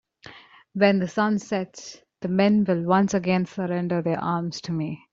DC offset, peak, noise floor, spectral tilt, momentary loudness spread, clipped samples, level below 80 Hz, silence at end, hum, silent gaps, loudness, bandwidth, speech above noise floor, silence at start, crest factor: under 0.1%; -4 dBFS; -48 dBFS; -6.5 dB/octave; 13 LU; under 0.1%; -64 dBFS; 0.15 s; none; none; -24 LUFS; 7.6 kHz; 25 dB; 0.25 s; 20 dB